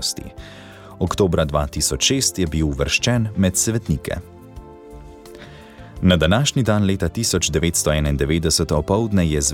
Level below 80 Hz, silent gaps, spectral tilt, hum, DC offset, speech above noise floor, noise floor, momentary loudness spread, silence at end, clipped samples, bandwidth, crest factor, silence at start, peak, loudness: -32 dBFS; none; -4 dB/octave; none; under 0.1%; 21 dB; -40 dBFS; 15 LU; 0 s; under 0.1%; 18 kHz; 16 dB; 0 s; -4 dBFS; -19 LUFS